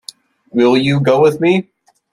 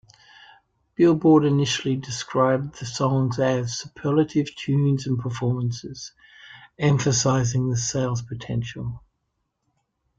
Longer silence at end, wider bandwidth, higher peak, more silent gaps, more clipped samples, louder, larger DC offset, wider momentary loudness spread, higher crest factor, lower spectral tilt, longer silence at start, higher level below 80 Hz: second, 0.5 s vs 1.2 s; first, 13 kHz vs 9 kHz; first, -2 dBFS vs -6 dBFS; neither; neither; first, -13 LUFS vs -23 LUFS; neither; second, 6 LU vs 14 LU; about the same, 14 dB vs 18 dB; first, -7 dB/octave vs -5.5 dB/octave; second, 0.55 s vs 1 s; about the same, -56 dBFS vs -54 dBFS